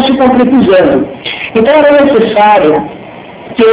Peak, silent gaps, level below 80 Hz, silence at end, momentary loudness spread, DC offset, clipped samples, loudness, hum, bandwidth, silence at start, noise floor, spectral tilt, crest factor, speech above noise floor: 0 dBFS; none; -40 dBFS; 0 s; 17 LU; under 0.1%; 4%; -7 LUFS; none; 4 kHz; 0 s; -28 dBFS; -9.5 dB/octave; 8 dB; 22 dB